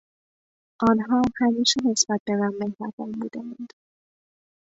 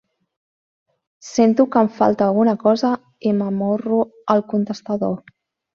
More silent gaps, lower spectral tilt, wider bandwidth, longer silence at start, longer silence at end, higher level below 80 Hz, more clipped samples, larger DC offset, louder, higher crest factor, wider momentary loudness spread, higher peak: first, 2.20-2.26 s, 2.93-2.98 s vs none; second, -3.5 dB/octave vs -7 dB/octave; about the same, 8 kHz vs 7.4 kHz; second, 0.8 s vs 1.25 s; first, 1.05 s vs 0.55 s; about the same, -58 dBFS vs -62 dBFS; neither; neither; second, -23 LUFS vs -19 LUFS; about the same, 20 dB vs 18 dB; first, 15 LU vs 7 LU; second, -6 dBFS vs -2 dBFS